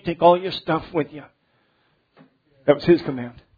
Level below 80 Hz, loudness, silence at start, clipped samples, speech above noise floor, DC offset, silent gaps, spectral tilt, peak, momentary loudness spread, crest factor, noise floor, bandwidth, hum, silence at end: -54 dBFS; -21 LUFS; 0.05 s; under 0.1%; 45 dB; under 0.1%; none; -8.5 dB/octave; -2 dBFS; 15 LU; 20 dB; -65 dBFS; 5 kHz; none; 0.25 s